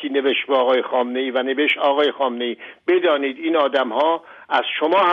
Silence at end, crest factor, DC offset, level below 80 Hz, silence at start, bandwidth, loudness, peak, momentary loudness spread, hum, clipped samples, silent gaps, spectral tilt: 0 s; 14 dB; under 0.1%; -74 dBFS; 0 s; 6.6 kHz; -19 LUFS; -6 dBFS; 5 LU; none; under 0.1%; none; -5 dB/octave